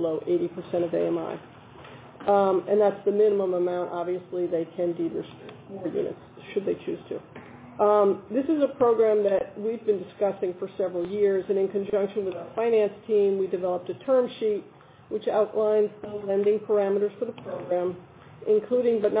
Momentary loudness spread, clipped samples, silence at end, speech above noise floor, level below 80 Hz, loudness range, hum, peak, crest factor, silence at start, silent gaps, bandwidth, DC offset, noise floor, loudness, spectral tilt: 13 LU; under 0.1%; 0 s; 21 dB; -66 dBFS; 5 LU; none; -10 dBFS; 16 dB; 0 s; none; 4 kHz; under 0.1%; -46 dBFS; -26 LUFS; -10.5 dB/octave